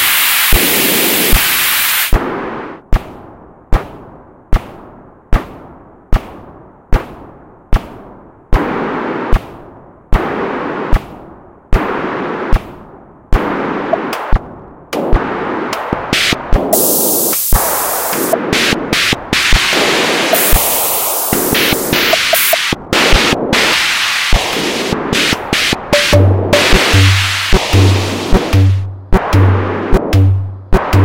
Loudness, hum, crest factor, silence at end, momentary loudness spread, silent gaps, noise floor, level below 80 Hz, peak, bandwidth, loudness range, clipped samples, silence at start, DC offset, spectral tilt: -12 LUFS; none; 12 dB; 0 s; 12 LU; none; -37 dBFS; -20 dBFS; 0 dBFS; 17.5 kHz; 13 LU; 0.7%; 0 s; 1%; -3.5 dB/octave